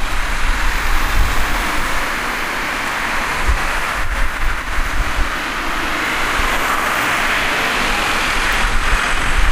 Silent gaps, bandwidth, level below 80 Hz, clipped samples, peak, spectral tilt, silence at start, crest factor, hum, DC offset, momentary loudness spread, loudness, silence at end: none; 16 kHz; -20 dBFS; under 0.1%; -2 dBFS; -3 dB/octave; 0 s; 16 dB; none; under 0.1%; 5 LU; -18 LUFS; 0 s